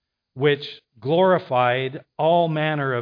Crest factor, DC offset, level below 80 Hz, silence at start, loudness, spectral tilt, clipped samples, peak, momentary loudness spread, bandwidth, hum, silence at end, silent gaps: 14 dB; under 0.1%; -72 dBFS; 0.35 s; -21 LUFS; -9 dB/octave; under 0.1%; -6 dBFS; 10 LU; 5.2 kHz; none; 0 s; none